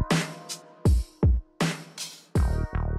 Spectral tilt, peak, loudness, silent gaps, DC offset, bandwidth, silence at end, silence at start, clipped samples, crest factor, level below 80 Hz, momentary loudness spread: -5.5 dB/octave; -12 dBFS; -28 LUFS; none; under 0.1%; 14 kHz; 0 s; 0 s; under 0.1%; 14 dB; -30 dBFS; 12 LU